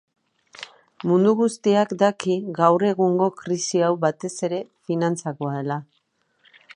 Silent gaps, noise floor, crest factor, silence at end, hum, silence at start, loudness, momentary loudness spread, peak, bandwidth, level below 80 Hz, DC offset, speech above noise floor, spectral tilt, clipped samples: none; -68 dBFS; 20 dB; 0.95 s; none; 0.6 s; -22 LUFS; 12 LU; -2 dBFS; 11 kHz; -74 dBFS; under 0.1%; 47 dB; -6 dB/octave; under 0.1%